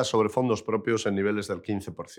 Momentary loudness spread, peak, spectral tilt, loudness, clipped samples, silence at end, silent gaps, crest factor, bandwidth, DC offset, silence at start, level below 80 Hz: 8 LU; -10 dBFS; -5.5 dB/octave; -27 LUFS; under 0.1%; 0 s; none; 16 dB; 15 kHz; under 0.1%; 0 s; -68 dBFS